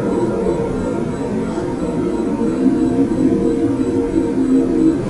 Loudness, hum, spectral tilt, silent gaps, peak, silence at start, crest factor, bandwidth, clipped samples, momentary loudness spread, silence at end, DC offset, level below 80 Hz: -17 LUFS; none; -8 dB/octave; none; -4 dBFS; 0 s; 14 dB; 11.5 kHz; under 0.1%; 6 LU; 0 s; 0.2%; -36 dBFS